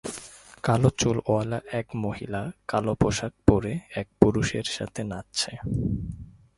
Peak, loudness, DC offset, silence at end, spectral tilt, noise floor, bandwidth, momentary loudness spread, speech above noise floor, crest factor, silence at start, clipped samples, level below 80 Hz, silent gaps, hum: 0 dBFS; -26 LUFS; under 0.1%; 0.3 s; -5.5 dB/octave; -45 dBFS; 11.5 kHz; 12 LU; 19 dB; 26 dB; 0.05 s; under 0.1%; -42 dBFS; none; none